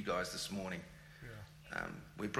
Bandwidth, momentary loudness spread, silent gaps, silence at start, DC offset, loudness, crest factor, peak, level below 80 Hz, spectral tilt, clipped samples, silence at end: 16 kHz; 15 LU; none; 0 s; under 0.1%; -43 LUFS; 20 dB; -22 dBFS; -64 dBFS; -4 dB/octave; under 0.1%; 0 s